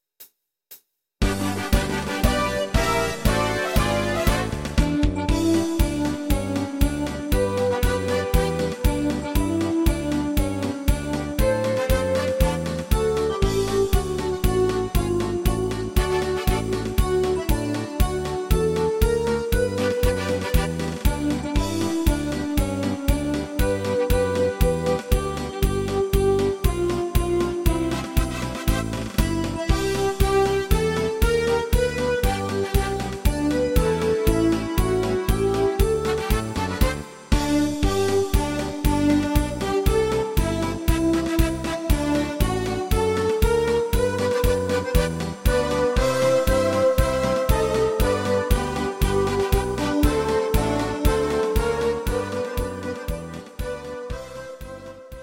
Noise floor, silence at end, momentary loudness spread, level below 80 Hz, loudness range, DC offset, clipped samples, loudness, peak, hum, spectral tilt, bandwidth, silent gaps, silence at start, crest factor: -52 dBFS; 0 s; 5 LU; -28 dBFS; 2 LU; under 0.1%; under 0.1%; -23 LUFS; -4 dBFS; none; -5.5 dB/octave; 17 kHz; none; 0.2 s; 18 dB